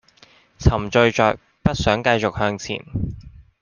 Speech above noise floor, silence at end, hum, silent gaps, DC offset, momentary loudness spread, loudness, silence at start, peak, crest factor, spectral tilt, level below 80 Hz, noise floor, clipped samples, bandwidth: 34 dB; 0.2 s; none; none; under 0.1%; 11 LU; -20 LUFS; 0.6 s; -2 dBFS; 18 dB; -5.5 dB/octave; -34 dBFS; -53 dBFS; under 0.1%; 9.8 kHz